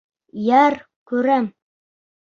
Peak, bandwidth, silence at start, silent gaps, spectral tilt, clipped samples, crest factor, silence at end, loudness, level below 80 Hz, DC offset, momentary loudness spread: -2 dBFS; 7.2 kHz; 0.35 s; 0.96-1.06 s; -6.5 dB/octave; under 0.1%; 18 dB; 0.85 s; -19 LUFS; -68 dBFS; under 0.1%; 15 LU